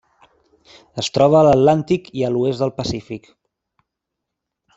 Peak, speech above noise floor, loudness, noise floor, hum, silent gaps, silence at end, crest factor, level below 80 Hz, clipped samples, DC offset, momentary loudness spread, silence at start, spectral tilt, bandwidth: -2 dBFS; 64 dB; -17 LUFS; -81 dBFS; none; none; 1.6 s; 18 dB; -50 dBFS; under 0.1%; under 0.1%; 19 LU; 0.95 s; -6.5 dB/octave; 8.2 kHz